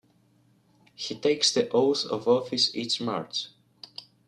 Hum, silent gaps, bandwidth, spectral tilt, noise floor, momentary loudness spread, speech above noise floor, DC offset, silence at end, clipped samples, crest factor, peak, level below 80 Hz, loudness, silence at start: none; none; 11.5 kHz; -3 dB/octave; -64 dBFS; 19 LU; 38 dB; under 0.1%; 0.25 s; under 0.1%; 20 dB; -8 dBFS; -74 dBFS; -26 LUFS; 1 s